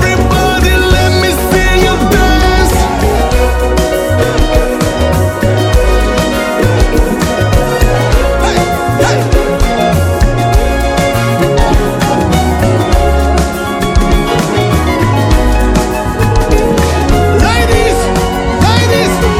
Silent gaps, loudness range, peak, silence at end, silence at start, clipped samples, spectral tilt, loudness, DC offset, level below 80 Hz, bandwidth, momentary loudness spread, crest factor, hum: none; 1 LU; 0 dBFS; 0 s; 0 s; 0.5%; -5.5 dB/octave; -10 LUFS; under 0.1%; -14 dBFS; 16.5 kHz; 3 LU; 10 dB; none